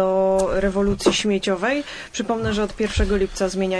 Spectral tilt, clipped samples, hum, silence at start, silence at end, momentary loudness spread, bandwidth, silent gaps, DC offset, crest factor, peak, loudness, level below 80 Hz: -4.5 dB/octave; under 0.1%; none; 0 s; 0 s; 6 LU; 11 kHz; none; under 0.1%; 18 dB; -2 dBFS; -21 LUFS; -32 dBFS